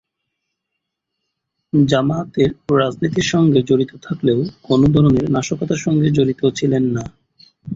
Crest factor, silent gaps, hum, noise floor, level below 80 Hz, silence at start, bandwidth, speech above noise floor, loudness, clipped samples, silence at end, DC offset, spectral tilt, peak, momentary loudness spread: 16 dB; none; none; -78 dBFS; -44 dBFS; 1.75 s; 7.8 kHz; 62 dB; -17 LUFS; under 0.1%; 0 s; under 0.1%; -6.5 dB/octave; -2 dBFS; 7 LU